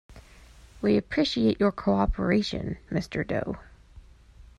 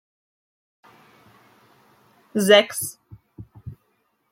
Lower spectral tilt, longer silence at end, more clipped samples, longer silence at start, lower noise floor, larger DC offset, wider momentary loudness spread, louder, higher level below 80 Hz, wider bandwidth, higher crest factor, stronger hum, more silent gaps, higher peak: first, -6.5 dB/octave vs -3 dB/octave; second, 0.15 s vs 0.6 s; neither; second, 0.1 s vs 2.35 s; second, -51 dBFS vs -69 dBFS; neither; second, 8 LU vs 27 LU; second, -27 LUFS vs -19 LUFS; first, -42 dBFS vs -62 dBFS; second, 9.6 kHz vs 16.5 kHz; second, 18 dB vs 24 dB; neither; neither; second, -10 dBFS vs -2 dBFS